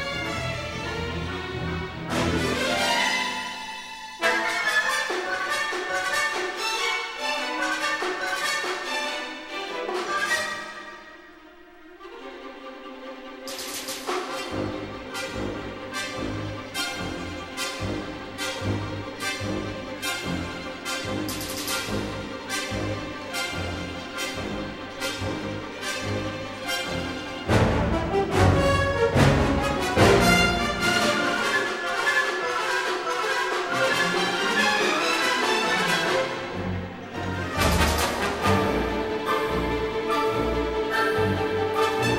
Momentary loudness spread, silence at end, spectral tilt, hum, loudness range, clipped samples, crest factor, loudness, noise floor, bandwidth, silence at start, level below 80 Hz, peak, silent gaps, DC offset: 11 LU; 0 s; -4 dB/octave; none; 10 LU; under 0.1%; 20 dB; -25 LUFS; -48 dBFS; 16 kHz; 0 s; -40 dBFS; -6 dBFS; none; under 0.1%